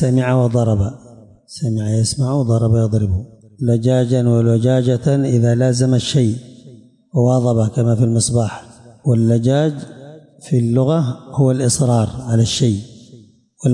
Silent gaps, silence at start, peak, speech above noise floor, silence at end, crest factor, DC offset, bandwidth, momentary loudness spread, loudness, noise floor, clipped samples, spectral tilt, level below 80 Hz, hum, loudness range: none; 0 s; -6 dBFS; 30 dB; 0 s; 10 dB; under 0.1%; 11.5 kHz; 9 LU; -16 LUFS; -45 dBFS; under 0.1%; -6.5 dB/octave; -46 dBFS; none; 2 LU